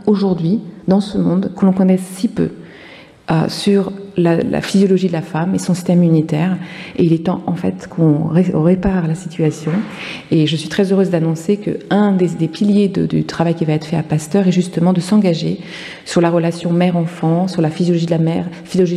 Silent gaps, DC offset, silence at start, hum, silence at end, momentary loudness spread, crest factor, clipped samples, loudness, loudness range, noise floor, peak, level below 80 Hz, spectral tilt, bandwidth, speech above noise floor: none; under 0.1%; 0 s; none; 0 s; 7 LU; 12 dB; under 0.1%; -16 LUFS; 2 LU; -39 dBFS; -2 dBFS; -44 dBFS; -7 dB/octave; 12.5 kHz; 24 dB